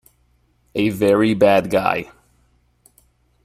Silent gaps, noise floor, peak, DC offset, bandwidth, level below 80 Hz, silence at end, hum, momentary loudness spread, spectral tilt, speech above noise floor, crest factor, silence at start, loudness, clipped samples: none; -61 dBFS; -2 dBFS; under 0.1%; 15 kHz; -52 dBFS; 1.4 s; 60 Hz at -50 dBFS; 12 LU; -6.5 dB/octave; 44 dB; 18 dB; 0.75 s; -17 LUFS; under 0.1%